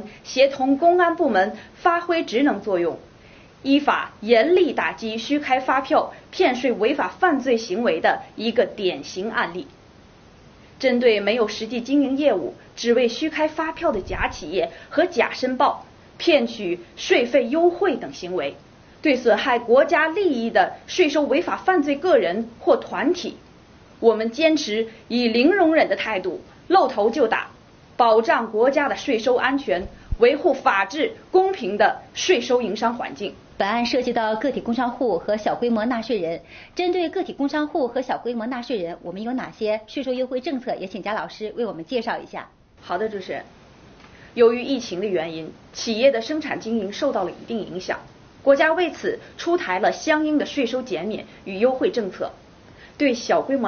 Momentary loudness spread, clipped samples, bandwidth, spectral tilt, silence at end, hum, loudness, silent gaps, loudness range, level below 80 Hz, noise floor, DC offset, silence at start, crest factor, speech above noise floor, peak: 11 LU; under 0.1%; 6.8 kHz; -2.5 dB/octave; 0 s; none; -21 LUFS; none; 6 LU; -50 dBFS; -49 dBFS; under 0.1%; 0 s; 18 dB; 28 dB; -4 dBFS